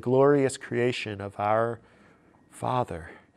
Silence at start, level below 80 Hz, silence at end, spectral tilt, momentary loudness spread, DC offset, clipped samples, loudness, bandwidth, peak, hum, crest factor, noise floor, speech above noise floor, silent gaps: 0.05 s; -60 dBFS; 0.2 s; -6 dB/octave; 13 LU; under 0.1%; under 0.1%; -27 LUFS; 12 kHz; -10 dBFS; none; 18 dB; -58 dBFS; 32 dB; none